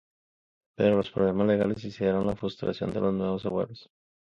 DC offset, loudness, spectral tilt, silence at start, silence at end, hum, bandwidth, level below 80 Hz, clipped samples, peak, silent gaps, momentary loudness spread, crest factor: under 0.1%; -28 LUFS; -8.5 dB/octave; 0.8 s; 0.5 s; none; 7.2 kHz; -56 dBFS; under 0.1%; -10 dBFS; none; 7 LU; 18 dB